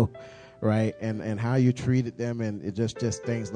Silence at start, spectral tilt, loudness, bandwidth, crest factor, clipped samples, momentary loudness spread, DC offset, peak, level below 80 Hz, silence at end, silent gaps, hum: 0 s; -7 dB/octave; -28 LUFS; 9.8 kHz; 18 dB; under 0.1%; 8 LU; under 0.1%; -10 dBFS; -56 dBFS; 0 s; none; none